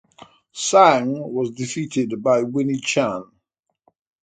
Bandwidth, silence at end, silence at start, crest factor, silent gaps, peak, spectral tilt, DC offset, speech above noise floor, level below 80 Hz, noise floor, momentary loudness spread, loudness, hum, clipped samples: 9.4 kHz; 1 s; 0.55 s; 20 dB; none; -2 dBFS; -4.5 dB/octave; under 0.1%; 56 dB; -66 dBFS; -75 dBFS; 12 LU; -20 LUFS; none; under 0.1%